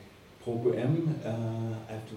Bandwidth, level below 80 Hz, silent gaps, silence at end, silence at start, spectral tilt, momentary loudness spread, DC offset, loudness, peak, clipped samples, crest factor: 12.5 kHz; -66 dBFS; none; 0 s; 0 s; -8.5 dB/octave; 9 LU; under 0.1%; -32 LUFS; -16 dBFS; under 0.1%; 16 dB